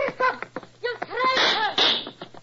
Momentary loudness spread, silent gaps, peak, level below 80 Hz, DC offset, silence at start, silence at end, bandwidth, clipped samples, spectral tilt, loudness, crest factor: 15 LU; none; -8 dBFS; -64 dBFS; under 0.1%; 0 s; 0.05 s; 7.8 kHz; under 0.1%; -2 dB/octave; -22 LUFS; 16 dB